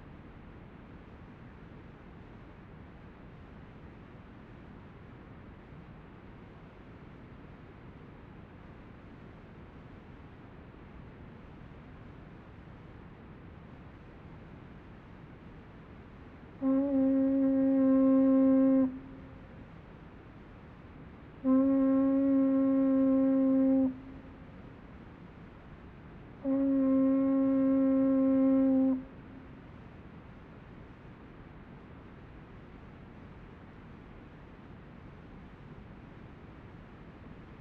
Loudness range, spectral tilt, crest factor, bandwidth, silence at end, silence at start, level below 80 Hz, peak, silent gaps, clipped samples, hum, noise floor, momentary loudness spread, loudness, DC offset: 24 LU; -10.5 dB/octave; 14 dB; 3.6 kHz; 0.05 s; 0 s; -58 dBFS; -18 dBFS; none; under 0.1%; none; -51 dBFS; 25 LU; -27 LUFS; under 0.1%